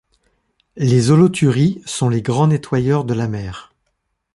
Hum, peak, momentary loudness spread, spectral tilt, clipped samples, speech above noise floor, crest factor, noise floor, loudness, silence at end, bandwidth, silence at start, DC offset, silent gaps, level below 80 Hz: none; -2 dBFS; 11 LU; -7 dB/octave; under 0.1%; 55 dB; 16 dB; -71 dBFS; -16 LUFS; 0.75 s; 11.5 kHz; 0.75 s; under 0.1%; none; -48 dBFS